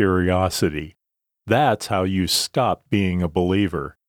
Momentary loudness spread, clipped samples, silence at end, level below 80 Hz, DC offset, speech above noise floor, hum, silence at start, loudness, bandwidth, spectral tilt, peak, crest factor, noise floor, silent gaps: 5 LU; under 0.1%; 0.2 s; -44 dBFS; under 0.1%; 62 dB; none; 0 s; -21 LUFS; 18.5 kHz; -5 dB/octave; -4 dBFS; 18 dB; -82 dBFS; none